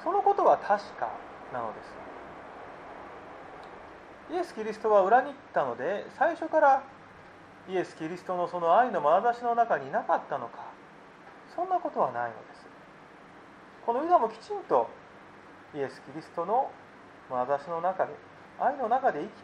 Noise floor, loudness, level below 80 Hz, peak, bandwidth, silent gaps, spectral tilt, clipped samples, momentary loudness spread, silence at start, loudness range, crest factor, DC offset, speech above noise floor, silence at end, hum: -51 dBFS; -28 LUFS; -70 dBFS; -10 dBFS; 9.6 kHz; none; -6 dB/octave; under 0.1%; 22 LU; 0 s; 8 LU; 20 dB; under 0.1%; 23 dB; 0 s; none